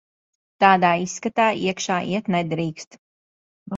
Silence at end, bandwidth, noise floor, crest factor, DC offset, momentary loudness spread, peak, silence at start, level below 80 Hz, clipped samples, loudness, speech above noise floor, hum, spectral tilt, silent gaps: 0 s; 7.8 kHz; under -90 dBFS; 22 dB; under 0.1%; 10 LU; 0 dBFS; 0.6 s; -64 dBFS; under 0.1%; -21 LUFS; over 69 dB; none; -4.5 dB/octave; 2.87-2.91 s, 2.98-3.66 s